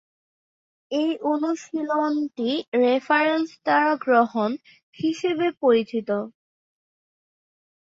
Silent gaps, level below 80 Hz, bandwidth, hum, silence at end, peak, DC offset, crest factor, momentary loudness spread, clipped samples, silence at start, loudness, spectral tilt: 2.68-2.72 s, 4.83-4.93 s; -74 dBFS; 7.8 kHz; none; 1.6 s; -8 dBFS; under 0.1%; 16 dB; 8 LU; under 0.1%; 0.9 s; -23 LUFS; -5 dB/octave